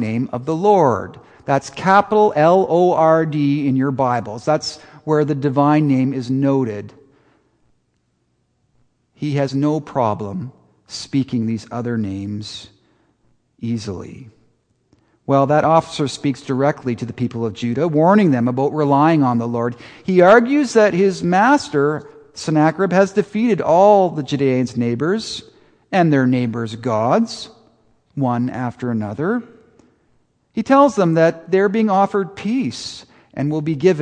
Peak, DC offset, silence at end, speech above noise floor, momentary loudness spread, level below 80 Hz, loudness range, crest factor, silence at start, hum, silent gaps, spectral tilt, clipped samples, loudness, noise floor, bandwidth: 0 dBFS; under 0.1%; 0 s; 49 dB; 15 LU; -58 dBFS; 10 LU; 18 dB; 0 s; none; none; -7 dB/octave; under 0.1%; -17 LUFS; -66 dBFS; 9.8 kHz